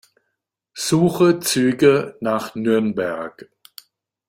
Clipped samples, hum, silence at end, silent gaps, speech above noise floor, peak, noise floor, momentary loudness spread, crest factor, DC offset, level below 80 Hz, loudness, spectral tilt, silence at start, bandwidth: under 0.1%; none; 0.85 s; none; 59 dB; -2 dBFS; -77 dBFS; 12 LU; 18 dB; under 0.1%; -58 dBFS; -19 LUFS; -5 dB/octave; 0.75 s; 16.5 kHz